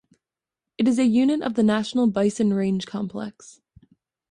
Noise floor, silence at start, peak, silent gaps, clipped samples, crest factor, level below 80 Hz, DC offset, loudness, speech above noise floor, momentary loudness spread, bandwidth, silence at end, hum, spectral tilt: -88 dBFS; 0.8 s; -10 dBFS; none; under 0.1%; 14 dB; -62 dBFS; under 0.1%; -22 LUFS; 66 dB; 11 LU; 10.5 kHz; 0.8 s; none; -6 dB/octave